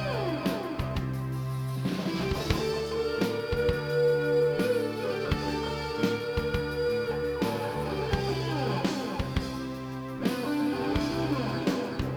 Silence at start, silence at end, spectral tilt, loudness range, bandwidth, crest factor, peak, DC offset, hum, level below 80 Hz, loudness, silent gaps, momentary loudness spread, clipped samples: 0 s; 0 s; -6.5 dB/octave; 3 LU; over 20 kHz; 20 dB; -8 dBFS; under 0.1%; none; -42 dBFS; -30 LUFS; none; 6 LU; under 0.1%